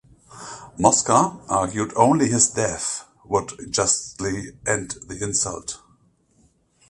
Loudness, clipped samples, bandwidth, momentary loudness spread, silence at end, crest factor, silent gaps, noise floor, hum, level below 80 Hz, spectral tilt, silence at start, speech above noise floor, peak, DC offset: -21 LUFS; under 0.1%; 11.5 kHz; 16 LU; 1.15 s; 22 dB; none; -61 dBFS; none; -50 dBFS; -3.5 dB/octave; 0.3 s; 39 dB; 0 dBFS; under 0.1%